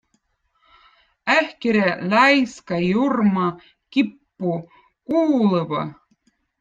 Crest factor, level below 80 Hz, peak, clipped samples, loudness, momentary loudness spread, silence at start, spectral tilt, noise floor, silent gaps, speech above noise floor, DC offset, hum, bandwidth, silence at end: 20 dB; -62 dBFS; -2 dBFS; under 0.1%; -20 LUFS; 11 LU; 1.25 s; -6.5 dB/octave; -68 dBFS; none; 49 dB; under 0.1%; none; 9.2 kHz; 0.65 s